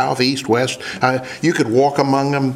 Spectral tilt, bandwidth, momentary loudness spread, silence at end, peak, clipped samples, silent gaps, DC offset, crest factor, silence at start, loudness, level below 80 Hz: -5 dB/octave; 15 kHz; 4 LU; 0 s; 0 dBFS; under 0.1%; none; under 0.1%; 16 dB; 0 s; -17 LUFS; -60 dBFS